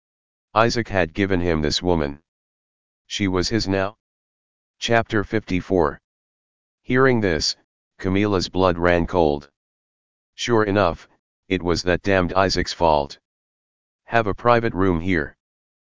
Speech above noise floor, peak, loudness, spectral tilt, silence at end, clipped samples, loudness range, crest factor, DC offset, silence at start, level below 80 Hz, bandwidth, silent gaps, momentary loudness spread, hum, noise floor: over 70 dB; 0 dBFS; -21 LUFS; -5.5 dB/octave; 0.55 s; under 0.1%; 3 LU; 22 dB; 1%; 0.5 s; -38 dBFS; 7.6 kHz; 2.28-3.05 s, 4.00-4.74 s, 6.04-6.78 s, 7.64-7.91 s, 9.56-10.33 s, 11.19-11.43 s, 13.25-13.99 s; 8 LU; none; under -90 dBFS